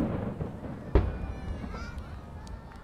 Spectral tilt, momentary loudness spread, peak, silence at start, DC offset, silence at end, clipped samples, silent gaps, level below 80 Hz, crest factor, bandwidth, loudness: -8.5 dB/octave; 15 LU; -10 dBFS; 0 s; under 0.1%; 0 s; under 0.1%; none; -36 dBFS; 24 dB; 9.4 kHz; -35 LUFS